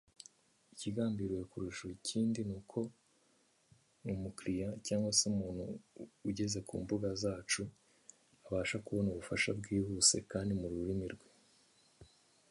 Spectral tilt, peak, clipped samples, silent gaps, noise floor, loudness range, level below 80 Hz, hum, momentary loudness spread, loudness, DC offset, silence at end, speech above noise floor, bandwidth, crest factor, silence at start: -3.5 dB/octave; -14 dBFS; under 0.1%; none; -73 dBFS; 6 LU; -60 dBFS; none; 15 LU; -37 LUFS; under 0.1%; 0.45 s; 35 dB; 11.5 kHz; 24 dB; 0.75 s